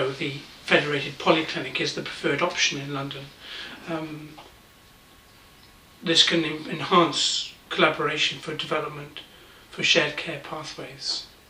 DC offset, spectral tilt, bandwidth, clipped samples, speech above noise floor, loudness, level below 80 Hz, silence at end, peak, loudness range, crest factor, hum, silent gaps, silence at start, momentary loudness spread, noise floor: under 0.1%; -3 dB/octave; 15.5 kHz; under 0.1%; 27 dB; -24 LUFS; -62 dBFS; 0.2 s; -4 dBFS; 7 LU; 24 dB; none; none; 0 s; 17 LU; -53 dBFS